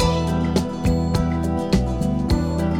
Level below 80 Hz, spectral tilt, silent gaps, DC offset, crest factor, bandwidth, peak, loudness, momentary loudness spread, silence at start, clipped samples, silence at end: -28 dBFS; -7 dB/octave; none; 0.6%; 16 dB; 16 kHz; -4 dBFS; -21 LUFS; 2 LU; 0 s; under 0.1%; 0 s